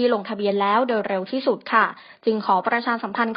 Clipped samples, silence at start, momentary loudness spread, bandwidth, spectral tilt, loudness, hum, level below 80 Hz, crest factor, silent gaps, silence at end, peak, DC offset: under 0.1%; 0 s; 5 LU; 5.4 kHz; -3 dB/octave; -22 LUFS; none; -74 dBFS; 18 dB; none; 0 s; -4 dBFS; under 0.1%